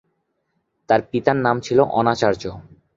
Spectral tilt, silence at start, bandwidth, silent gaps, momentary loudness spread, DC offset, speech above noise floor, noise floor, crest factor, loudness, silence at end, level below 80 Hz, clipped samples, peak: -6 dB/octave; 0.9 s; 7.8 kHz; none; 5 LU; under 0.1%; 53 dB; -72 dBFS; 20 dB; -19 LUFS; 0.35 s; -54 dBFS; under 0.1%; -2 dBFS